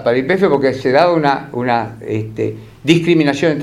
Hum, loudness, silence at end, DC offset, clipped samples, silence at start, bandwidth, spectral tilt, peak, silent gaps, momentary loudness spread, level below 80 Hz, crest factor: none; -15 LUFS; 0 s; under 0.1%; under 0.1%; 0 s; 12 kHz; -6.5 dB/octave; 0 dBFS; none; 10 LU; -50 dBFS; 14 dB